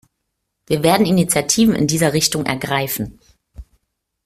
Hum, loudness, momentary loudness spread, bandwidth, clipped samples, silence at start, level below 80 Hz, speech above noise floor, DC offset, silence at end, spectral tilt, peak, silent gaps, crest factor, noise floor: none; -16 LUFS; 9 LU; 16 kHz; under 0.1%; 0.7 s; -46 dBFS; 58 dB; under 0.1%; 0.65 s; -4 dB/octave; -2 dBFS; none; 18 dB; -75 dBFS